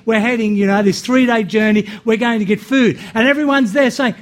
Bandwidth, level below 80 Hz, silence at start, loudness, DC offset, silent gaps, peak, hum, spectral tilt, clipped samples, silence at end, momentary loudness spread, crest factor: 15.5 kHz; -54 dBFS; 0.05 s; -14 LUFS; under 0.1%; none; -2 dBFS; none; -5.5 dB/octave; under 0.1%; 0 s; 3 LU; 12 dB